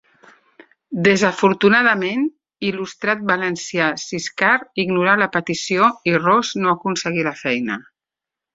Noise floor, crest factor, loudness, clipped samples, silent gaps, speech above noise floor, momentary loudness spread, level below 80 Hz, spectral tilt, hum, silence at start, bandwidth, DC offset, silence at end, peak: -87 dBFS; 18 dB; -18 LUFS; under 0.1%; none; 69 dB; 10 LU; -60 dBFS; -4.5 dB/octave; none; 0.9 s; 8 kHz; under 0.1%; 0.75 s; -2 dBFS